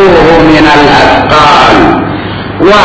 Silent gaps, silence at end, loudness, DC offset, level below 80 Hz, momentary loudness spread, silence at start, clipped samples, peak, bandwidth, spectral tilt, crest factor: none; 0 s; -3 LUFS; under 0.1%; -24 dBFS; 10 LU; 0 s; 20%; 0 dBFS; 8 kHz; -5.5 dB/octave; 4 dB